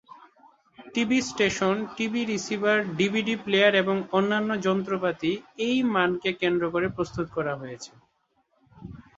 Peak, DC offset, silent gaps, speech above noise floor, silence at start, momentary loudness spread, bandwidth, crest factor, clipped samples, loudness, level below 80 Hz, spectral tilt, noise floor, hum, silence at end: -6 dBFS; under 0.1%; none; 45 dB; 0.8 s; 9 LU; 8 kHz; 20 dB; under 0.1%; -25 LUFS; -60 dBFS; -4.5 dB/octave; -70 dBFS; none; 0.15 s